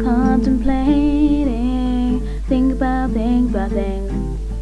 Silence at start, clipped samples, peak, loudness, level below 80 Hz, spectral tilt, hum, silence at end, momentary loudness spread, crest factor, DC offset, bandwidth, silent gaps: 0 s; under 0.1%; -4 dBFS; -18 LUFS; -24 dBFS; -8 dB/octave; none; 0 s; 7 LU; 12 dB; 0.8%; 11 kHz; none